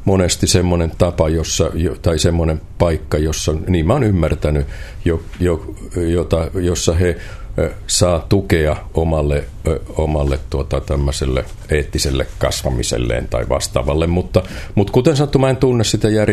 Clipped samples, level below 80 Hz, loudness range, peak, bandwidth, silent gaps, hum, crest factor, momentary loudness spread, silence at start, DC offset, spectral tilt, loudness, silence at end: under 0.1%; -26 dBFS; 3 LU; 0 dBFS; 14 kHz; none; none; 16 dB; 7 LU; 0 s; under 0.1%; -5.5 dB/octave; -17 LUFS; 0 s